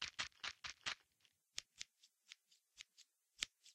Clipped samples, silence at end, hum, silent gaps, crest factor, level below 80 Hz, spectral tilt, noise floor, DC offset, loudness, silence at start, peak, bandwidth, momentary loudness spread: under 0.1%; 0 s; none; none; 34 dB; -80 dBFS; 1 dB/octave; -80 dBFS; under 0.1%; -49 LUFS; 0 s; -20 dBFS; 15 kHz; 17 LU